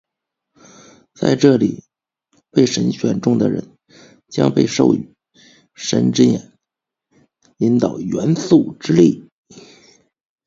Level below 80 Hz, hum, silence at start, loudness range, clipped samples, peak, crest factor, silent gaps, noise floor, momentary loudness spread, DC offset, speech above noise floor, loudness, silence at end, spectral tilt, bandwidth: -56 dBFS; none; 1.2 s; 1 LU; under 0.1%; 0 dBFS; 18 dB; 9.32-9.43 s; -83 dBFS; 11 LU; under 0.1%; 68 dB; -17 LUFS; 0.85 s; -6 dB/octave; 7.8 kHz